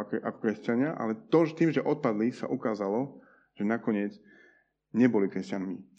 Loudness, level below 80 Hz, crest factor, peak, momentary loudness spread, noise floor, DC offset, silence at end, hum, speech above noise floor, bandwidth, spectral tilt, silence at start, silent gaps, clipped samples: -29 LUFS; -80 dBFS; 18 dB; -12 dBFS; 10 LU; -64 dBFS; under 0.1%; 0.15 s; none; 35 dB; 8 kHz; -8 dB/octave; 0 s; none; under 0.1%